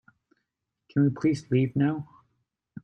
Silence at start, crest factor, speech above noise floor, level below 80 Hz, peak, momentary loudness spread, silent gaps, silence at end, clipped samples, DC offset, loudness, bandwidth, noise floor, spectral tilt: 0.95 s; 16 dB; 58 dB; -66 dBFS; -12 dBFS; 10 LU; none; 0.05 s; under 0.1%; under 0.1%; -26 LUFS; 9.4 kHz; -83 dBFS; -8.5 dB/octave